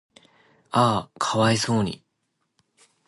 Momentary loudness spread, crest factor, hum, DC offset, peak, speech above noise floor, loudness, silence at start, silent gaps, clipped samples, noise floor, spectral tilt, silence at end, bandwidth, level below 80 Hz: 8 LU; 20 dB; none; under 0.1%; -6 dBFS; 53 dB; -23 LUFS; 0.75 s; none; under 0.1%; -75 dBFS; -5 dB/octave; 1.1 s; 11.5 kHz; -56 dBFS